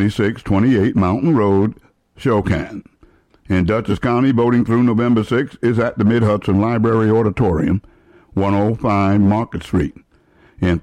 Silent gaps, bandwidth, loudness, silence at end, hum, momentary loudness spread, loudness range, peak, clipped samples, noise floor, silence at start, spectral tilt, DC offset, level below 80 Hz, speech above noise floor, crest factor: none; 10.5 kHz; -17 LUFS; 0 s; none; 7 LU; 3 LU; -6 dBFS; under 0.1%; -52 dBFS; 0 s; -8.5 dB/octave; under 0.1%; -38 dBFS; 37 dB; 10 dB